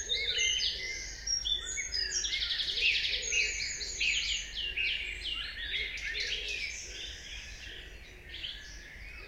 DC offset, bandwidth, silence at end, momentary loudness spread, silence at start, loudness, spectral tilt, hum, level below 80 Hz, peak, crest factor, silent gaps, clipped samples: under 0.1%; 16 kHz; 0 s; 17 LU; 0 s; -31 LUFS; 1 dB/octave; none; -50 dBFS; -16 dBFS; 18 dB; none; under 0.1%